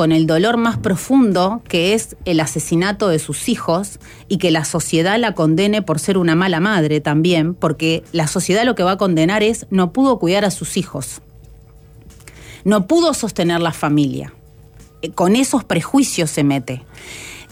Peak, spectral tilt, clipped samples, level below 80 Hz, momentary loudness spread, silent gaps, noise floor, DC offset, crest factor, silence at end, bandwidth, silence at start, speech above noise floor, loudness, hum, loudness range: -4 dBFS; -5 dB/octave; under 0.1%; -46 dBFS; 10 LU; none; -43 dBFS; under 0.1%; 12 dB; 0.05 s; 16.5 kHz; 0 s; 27 dB; -16 LUFS; none; 3 LU